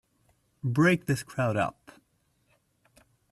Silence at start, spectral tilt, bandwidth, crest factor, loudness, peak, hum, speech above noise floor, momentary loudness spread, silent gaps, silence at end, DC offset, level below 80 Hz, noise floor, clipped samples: 0.65 s; -6.5 dB/octave; 13.5 kHz; 20 dB; -27 LUFS; -10 dBFS; none; 44 dB; 9 LU; none; 1.6 s; under 0.1%; -64 dBFS; -71 dBFS; under 0.1%